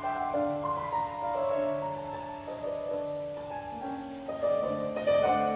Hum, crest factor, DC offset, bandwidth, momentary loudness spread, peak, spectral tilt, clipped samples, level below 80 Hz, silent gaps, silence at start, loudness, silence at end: none; 16 dB; under 0.1%; 4 kHz; 11 LU; -16 dBFS; -4.5 dB/octave; under 0.1%; -60 dBFS; none; 0 s; -32 LUFS; 0 s